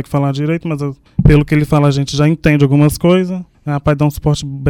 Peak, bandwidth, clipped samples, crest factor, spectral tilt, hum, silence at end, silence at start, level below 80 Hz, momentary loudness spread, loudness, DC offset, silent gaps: 0 dBFS; 16 kHz; 0.2%; 12 dB; -7 dB/octave; none; 0 s; 0 s; -28 dBFS; 10 LU; -13 LUFS; under 0.1%; none